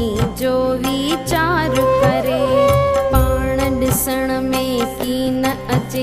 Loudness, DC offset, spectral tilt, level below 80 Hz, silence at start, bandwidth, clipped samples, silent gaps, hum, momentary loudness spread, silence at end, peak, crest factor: -17 LUFS; under 0.1%; -5.5 dB/octave; -28 dBFS; 0 s; 15.5 kHz; under 0.1%; none; none; 6 LU; 0 s; -2 dBFS; 14 dB